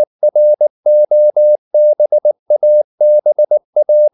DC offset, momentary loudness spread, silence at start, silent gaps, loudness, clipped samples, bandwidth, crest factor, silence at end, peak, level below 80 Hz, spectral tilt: under 0.1%; 3 LU; 0 s; 0.07-0.19 s, 0.70-0.83 s, 1.58-1.71 s, 2.39-2.46 s, 2.84-2.98 s, 3.65-3.73 s; -11 LUFS; under 0.1%; 0.9 kHz; 6 dB; 0.05 s; -4 dBFS; -82 dBFS; -11 dB/octave